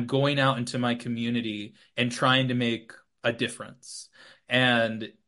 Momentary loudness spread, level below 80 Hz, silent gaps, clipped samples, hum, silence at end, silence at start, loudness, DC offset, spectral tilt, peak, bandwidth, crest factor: 16 LU; -70 dBFS; none; under 0.1%; none; 0.2 s; 0 s; -26 LUFS; under 0.1%; -5 dB/octave; -6 dBFS; 11.5 kHz; 20 dB